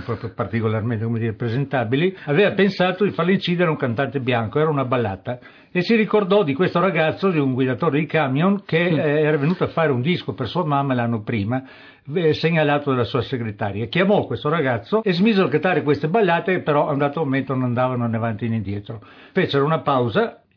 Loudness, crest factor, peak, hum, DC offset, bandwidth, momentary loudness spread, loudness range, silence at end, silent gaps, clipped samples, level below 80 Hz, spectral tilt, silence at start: -20 LUFS; 14 dB; -6 dBFS; none; under 0.1%; 5.4 kHz; 7 LU; 3 LU; 0.2 s; none; under 0.1%; -58 dBFS; -9 dB/octave; 0 s